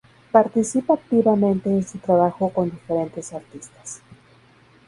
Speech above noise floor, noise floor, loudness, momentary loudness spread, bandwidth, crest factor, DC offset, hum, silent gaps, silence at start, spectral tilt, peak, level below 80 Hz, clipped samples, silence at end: 33 dB; -53 dBFS; -20 LUFS; 19 LU; 11.5 kHz; 22 dB; under 0.1%; none; none; 0.35 s; -7.5 dB/octave; 0 dBFS; -58 dBFS; under 0.1%; 0.9 s